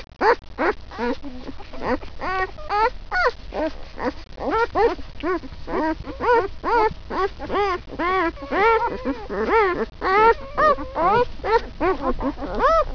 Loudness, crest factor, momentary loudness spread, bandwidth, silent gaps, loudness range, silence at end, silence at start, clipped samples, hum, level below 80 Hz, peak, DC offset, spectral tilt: -22 LUFS; 18 dB; 10 LU; 5.4 kHz; none; 5 LU; 0 s; 0 s; under 0.1%; none; -36 dBFS; -4 dBFS; 0.2%; -6 dB/octave